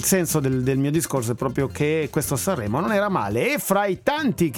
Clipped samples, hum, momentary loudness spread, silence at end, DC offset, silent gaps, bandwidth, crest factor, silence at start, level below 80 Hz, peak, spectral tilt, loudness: under 0.1%; none; 3 LU; 0 s; under 0.1%; none; 18 kHz; 18 dB; 0 s; -48 dBFS; -4 dBFS; -5 dB/octave; -22 LUFS